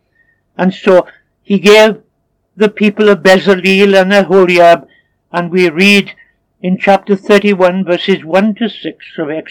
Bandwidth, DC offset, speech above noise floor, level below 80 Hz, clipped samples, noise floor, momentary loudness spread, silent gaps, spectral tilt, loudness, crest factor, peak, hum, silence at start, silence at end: 18 kHz; under 0.1%; 52 dB; -56 dBFS; 0.9%; -62 dBFS; 13 LU; none; -5.5 dB/octave; -9 LUFS; 10 dB; 0 dBFS; none; 0.6 s; 0.1 s